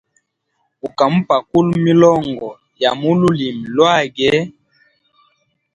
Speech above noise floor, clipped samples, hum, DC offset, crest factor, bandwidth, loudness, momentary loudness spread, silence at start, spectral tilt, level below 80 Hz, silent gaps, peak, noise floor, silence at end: 54 dB; under 0.1%; none; under 0.1%; 16 dB; 9.8 kHz; -15 LUFS; 16 LU; 0.85 s; -6.5 dB/octave; -52 dBFS; none; 0 dBFS; -68 dBFS; 1.25 s